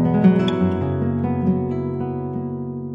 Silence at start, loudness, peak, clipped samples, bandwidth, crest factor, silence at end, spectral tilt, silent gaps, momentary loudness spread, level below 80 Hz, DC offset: 0 s; -21 LUFS; -2 dBFS; under 0.1%; 5.2 kHz; 16 dB; 0 s; -9.5 dB/octave; none; 11 LU; -48 dBFS; under 0.1%